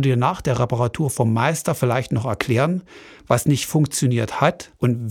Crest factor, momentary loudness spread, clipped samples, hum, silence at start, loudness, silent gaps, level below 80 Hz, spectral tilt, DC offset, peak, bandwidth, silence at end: 20 dB; 4 LU; under 0.1%; none; 0 s; -21 LUFS; none; -50 dBFS; -6 dB/octave; under 0.1%; 0 dBFS; 17 kHz; 0 s